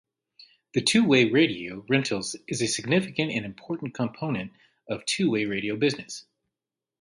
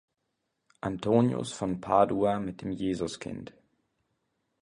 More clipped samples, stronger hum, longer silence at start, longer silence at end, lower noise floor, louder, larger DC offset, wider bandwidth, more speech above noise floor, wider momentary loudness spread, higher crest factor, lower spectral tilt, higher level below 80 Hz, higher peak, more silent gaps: neither; neither; about the same, 0.75 s vs 0.85 s; second, 0.8 s vs 1.1 s; first, -89 dBFS vs -81 dBFS; first, -26 LUFS vs -29 LUFS; neither; about the same, 11.5 kHz vs 11 kHz; first, 63 dB vs 53 dB; about the same, 15 LU vs 14 LU; about the same, 20 dB vs 22 dB; second, -4.5 dB/octave vs -6.5 dB/octave; second, -64 dBFS vs -58 dBFS; about the same, -8 dBFS vs -10 dBFS; neither